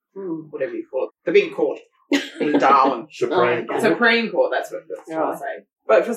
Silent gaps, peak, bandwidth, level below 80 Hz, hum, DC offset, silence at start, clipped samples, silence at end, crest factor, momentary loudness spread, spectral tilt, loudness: none; -4 dBFS; 14 kHz; -82 dBFS; none; under 0.1%; 0.15 s; under 0.1%; 0 s; 16 dB; 15 LU; -4.5 dB/octave; -20 LUFS